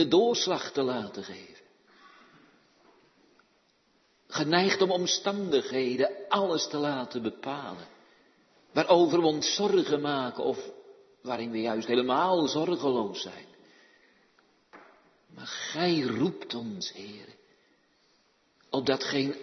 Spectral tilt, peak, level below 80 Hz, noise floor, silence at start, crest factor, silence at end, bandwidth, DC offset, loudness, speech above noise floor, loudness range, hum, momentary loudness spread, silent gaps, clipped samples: -4 dB/octave; -8 dBFS; -76 dBFS; -68 dBFS; 0 s; 22 dB; 0 s; 6.4 kHz; under 0.1%; -28 LUFS; 40 dB; 8 LU; none; 15 LU; none; under 0.1%